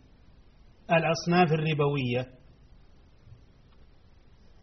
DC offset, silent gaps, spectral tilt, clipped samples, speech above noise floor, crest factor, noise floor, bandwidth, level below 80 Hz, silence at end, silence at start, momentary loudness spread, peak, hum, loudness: under 0.1%; none; -5 dB/octave; under 0.1%; 30 dB; 20 dB; -55 dBFS; 6.2 kHz; -58 dBFS; 2.35 s; 0.9 s; 8 LU; -10 dBFS; none; -26 LUFS